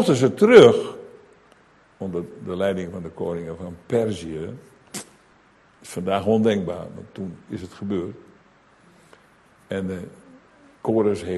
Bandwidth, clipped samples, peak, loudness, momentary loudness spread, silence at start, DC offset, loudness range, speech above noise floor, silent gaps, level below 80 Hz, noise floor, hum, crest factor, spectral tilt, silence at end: 12.5 kHz; under 0.1%; 0 dBFS; -21 LUFS; 21 LU; 0 s; under 0.1%; 14 LU; 35 dB; none; -52 dBFS; -56 dBFS; none; 22 dB; -6 dB/octave; 0 s